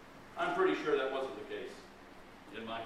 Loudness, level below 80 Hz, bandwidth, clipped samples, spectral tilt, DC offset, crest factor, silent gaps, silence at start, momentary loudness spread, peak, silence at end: -36 LUFS; -64 dBFS; 13 kHz; under 0.1%; -5 dB/octave; under 0.1%; 18 dB; none; 0 s; 23 LU; -18 dBFS; 0 s